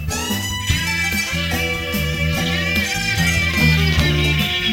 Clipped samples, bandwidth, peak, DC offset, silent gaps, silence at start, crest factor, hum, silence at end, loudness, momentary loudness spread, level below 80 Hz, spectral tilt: under 0.1%; 17 kHz; -2 dBFS; under 0.1%; none; 0 s; 16 dB; none; 0 s; -18 LUFS; 6 LU; -30 dBFS; -4 dB/octave